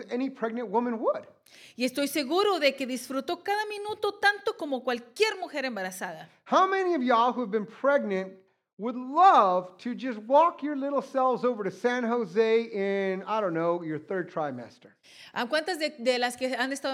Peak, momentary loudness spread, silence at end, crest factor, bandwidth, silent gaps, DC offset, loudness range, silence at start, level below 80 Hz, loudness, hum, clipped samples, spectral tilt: -8 dBFS; 11 LU; 0 s; 20 dB; 16.5 kHz; 8.73-8.77 s; under 0.1%; 5 LU; 0 s; -86 dBFS; -27 LUFS; none; under 0.1%; -4 dB/octave